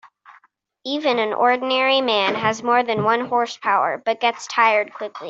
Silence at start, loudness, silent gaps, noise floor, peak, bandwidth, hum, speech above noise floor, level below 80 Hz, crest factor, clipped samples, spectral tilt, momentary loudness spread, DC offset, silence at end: 0.05 s; -19 LUFS; none; -57 dBFS; -4 dBFS; 8 kHz; none; 38 dB; -68 dBFS; 16 dB; under 0.1%; -3.5 dB/octave; 5 LU; under 0.1%; 0 s